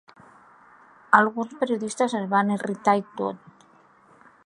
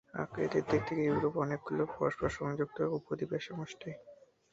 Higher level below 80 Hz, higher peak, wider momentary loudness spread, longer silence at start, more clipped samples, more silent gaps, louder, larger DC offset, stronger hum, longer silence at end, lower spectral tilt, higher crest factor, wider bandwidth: second, -76 dBFS vs -60 dBFS; first, -2 dBFS vs -16 dBFS; about the same, 12 LU vs 11 LU; first, 1.1 s vs 0.15 s; neither; neither; first, -24 LUFS vs -35 LUFS; neither; neither; first, 1.1 s vs 0.4 s; second, -5.5 dB/octave vs -7 dB/octave; first, 24 dB vs 18 dB; first, 11.5 kHz vs 7.8 kHz